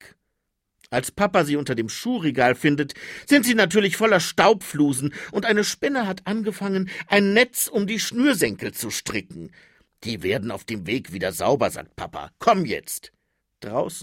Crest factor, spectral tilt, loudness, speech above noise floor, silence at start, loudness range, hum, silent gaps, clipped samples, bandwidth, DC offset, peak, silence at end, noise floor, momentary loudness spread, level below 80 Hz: 20 dB; -4 dB/octave; -22 LUFS; 55 dB; 0.05 s; 7 LU; none; none; under 0.1%; 16.5 kHz; under 0.1%; -2 dBFS; 0 s; -77 dBFS; 13 LU; -58 dBFS